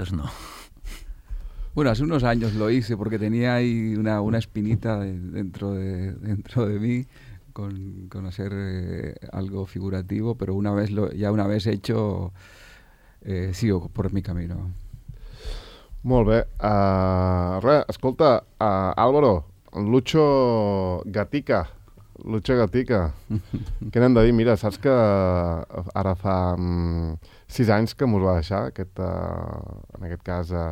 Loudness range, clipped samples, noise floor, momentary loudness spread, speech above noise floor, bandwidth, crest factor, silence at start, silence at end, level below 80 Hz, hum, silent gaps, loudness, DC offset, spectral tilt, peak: 9 LU; under 0.1%; -51 dBFS; 17 LU; 29 dB; 15 kHz; 20 dB; 0 s; 0 s; -40 dBFS; none; none; -23 LUFS; under 0.1%; -8 dB/octave; -4 dBFS